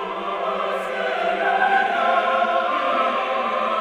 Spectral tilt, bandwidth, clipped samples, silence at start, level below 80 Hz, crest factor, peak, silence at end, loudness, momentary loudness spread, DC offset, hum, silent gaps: -4 dB/octave; 12.5 kHz; under 0.1%; 0 s; -62 dBFS; 14 dB; -6 dBFS; 0 s; -21 LUFS; 6 LU; under 0.1%; none; none